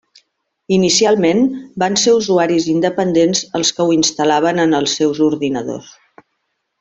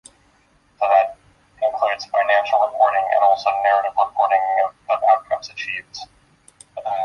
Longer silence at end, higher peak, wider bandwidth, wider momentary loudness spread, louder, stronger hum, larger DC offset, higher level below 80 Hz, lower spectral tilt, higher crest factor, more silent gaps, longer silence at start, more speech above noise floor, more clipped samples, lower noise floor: first, 0.9 s vs 0 s; first, 0 dBFS vs -4 dBFS; second, 8.4 kHz vs 10.5 kHz; second, 7 LU vs 10 LU; first, -14 LUFS vs -19 LUFS; neither; neither; first, -56 dBFS vs -62 dBFS; first, -4 dB/octave vs -1.5 dB/octave; about the same, 14 dB vs 16 dB; neither; about the same, 0.7 s vs 0.8 s; first, 56 dB vs 38 dB; neither; first, -71 dBFS vs -58 dBFS